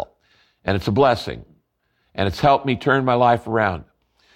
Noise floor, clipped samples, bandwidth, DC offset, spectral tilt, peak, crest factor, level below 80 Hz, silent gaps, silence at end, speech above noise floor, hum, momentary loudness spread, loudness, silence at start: -68 dBFS; under 0.1%; 16 kHz; under 0.1%; -7 dB/octave; -4 dBFS; 18 dB; -46 dBFS; none; 0.55 s; 50 dB; none; 16 LU; -19 LUFS; 0 s